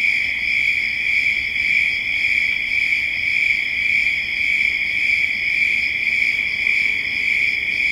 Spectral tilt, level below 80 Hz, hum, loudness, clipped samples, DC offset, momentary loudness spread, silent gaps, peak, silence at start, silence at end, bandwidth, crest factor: -1 dB/octave; -48 dBFS; none; -16 LUFS; under 0.1%; under 0.1%; 2 LU; none; -6 dBFS; 0 s; 0 s; 16.5 kHz; 14 dB